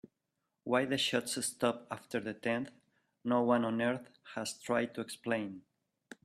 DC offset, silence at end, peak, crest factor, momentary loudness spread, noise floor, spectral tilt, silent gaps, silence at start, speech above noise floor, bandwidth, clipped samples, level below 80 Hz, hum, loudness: under 0.1%; 0.65 s; -16 dBFS; 20 dB; 13 LU; -85 dBFS; -4 dB/octave; none; 0.65 s; 51 dB; 14.5 kHz; under 0.1%; -76 dBFS; none; -35 LUFS